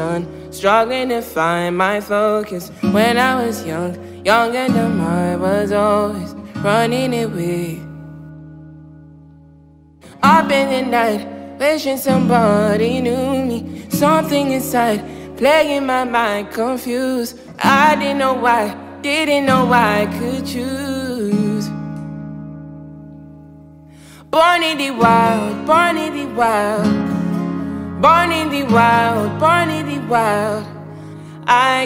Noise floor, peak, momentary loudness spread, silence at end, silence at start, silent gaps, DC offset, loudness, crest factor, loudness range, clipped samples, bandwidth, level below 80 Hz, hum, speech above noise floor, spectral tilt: -46 dBFS; 0 dBFS; 15 LU; 0 s; 0 s; none; under 0.1%; -16 LUFS; 16 dB; 7 LU; under 0.1%; 16 kHz; -48 dBFS; none; 30 dB; -5.5 dB/octave